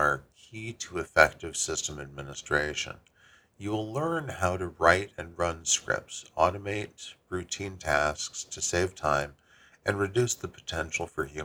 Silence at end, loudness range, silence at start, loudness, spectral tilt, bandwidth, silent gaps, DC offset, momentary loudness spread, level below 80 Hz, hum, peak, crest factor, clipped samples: 0 s; 3 LU; 0 s; -29 LUFS; -3 dB/octave; over 20 kHz; none; under 0.1%; 16 LU; -52 dBFS; none; -2 dBFS; 28 dB; under 0.1%